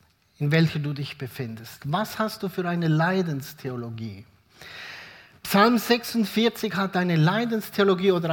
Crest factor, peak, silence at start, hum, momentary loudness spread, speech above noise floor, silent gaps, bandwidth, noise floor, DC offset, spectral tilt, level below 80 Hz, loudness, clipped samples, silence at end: 22 dB; -4 dBFS; 0.4 s; none; 18 LU; 22 dB; none; 18 kHz; -46 dBFS; under 0.1%; -6 dB/octave; -64 dBFS; -24 LUFS; under 0.1%; 0 s